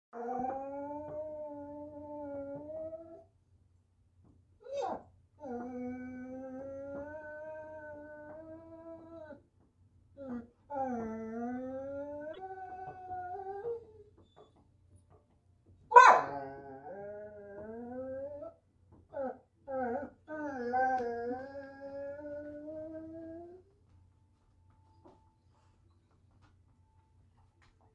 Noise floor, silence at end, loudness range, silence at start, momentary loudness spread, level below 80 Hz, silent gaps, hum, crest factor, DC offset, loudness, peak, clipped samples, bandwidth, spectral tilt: -69 dBFS; 2.85 s; 19 LU; 0.15 s; 15 LU; -72 dBFS; none; none; 32 dB; under 0.1%; -35 LUFS; -6 dBFS; under 0.1%; 8.8 kHz; -4.5 dB/octave